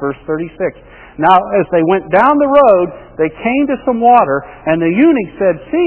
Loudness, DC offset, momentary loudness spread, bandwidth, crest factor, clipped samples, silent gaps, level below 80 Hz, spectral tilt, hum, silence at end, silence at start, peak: -12 LUFS; under 0.1%; 11 LU; 4 kHz; 12 dB; 0.2%; none; -44 dBFS; -10.5 dB/octave; none; 0 s; 0 s; 0 dBFS